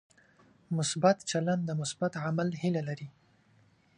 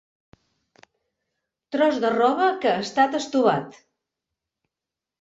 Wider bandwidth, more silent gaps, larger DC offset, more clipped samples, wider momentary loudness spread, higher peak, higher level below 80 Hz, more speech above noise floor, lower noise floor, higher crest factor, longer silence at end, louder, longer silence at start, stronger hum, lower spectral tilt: first, 10.5 kHz vs 8 kHz; neither; neither; neither; first, 11 LU vs 7 LU; second, -10 dBFS vs -6 dBFS; about the same, -72 dBFS vs -70 dBFS; second, 35 dB vs 67 dB; second, -65 dBFS vs -88 dBFS; about the same, 22 dB vs 18 dB; second, 0.9 s vs 1.5 s; second, -31 LUFS vs -22 LUFS; second, 0.7 s vs 1.7 s; neither; about the same, -5.5 dB/octave vs -5 dB/octave